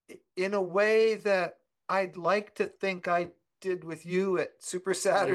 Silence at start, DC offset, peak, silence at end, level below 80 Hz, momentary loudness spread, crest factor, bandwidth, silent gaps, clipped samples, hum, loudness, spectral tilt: 0.1 s; under 0.1%; -14 dBFS; 0 s; -80 dBFS; 11 LU; 16 dB; 12.5 kHz; none; under 0.1%; none; -29 LUFS; -4.5 dB/octave